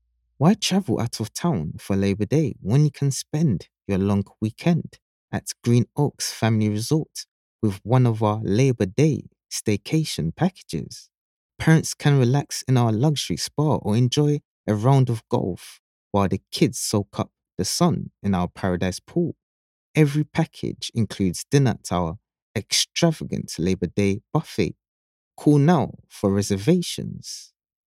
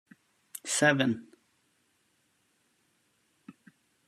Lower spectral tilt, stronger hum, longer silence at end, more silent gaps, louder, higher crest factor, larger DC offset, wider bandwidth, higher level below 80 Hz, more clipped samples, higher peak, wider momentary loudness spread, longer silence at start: first, -6 dB/octave vs -3.5 dB/octave; neither; about the same, 0.45 s vs 0.55 s; first, 5.02-5.28 s, 7.28-7.59 s, 11.18-11.50 s, 14.45-14.64 s, 15.79-16.11 s, 19.43-19.94 s, 22.42-22.54 s, 24.88-25.31 s vs none; first, -23 LUFS vs -27 LUFS; second, 20 dB vs 26 dB; neither; first, 15.5 kHz vs 13.5 kHz; first, -54 dBFS vs -80 dBFS; neither; first, -4 dBFS vs -10 dBFS; second, 11 LU vs 18 LU; second, 0.4 s vs 0.55 s